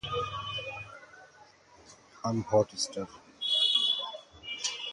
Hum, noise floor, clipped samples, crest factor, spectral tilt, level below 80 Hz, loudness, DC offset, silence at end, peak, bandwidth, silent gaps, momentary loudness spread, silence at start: none; -58 dBFS; under 0.1%; 20 dB; -3 dB/octave; -62 dBFS; -30 LUFS; under 0.1%; 0 s; -12 dBFS; 11.5 kHz; none; 19 LU; 0.05 s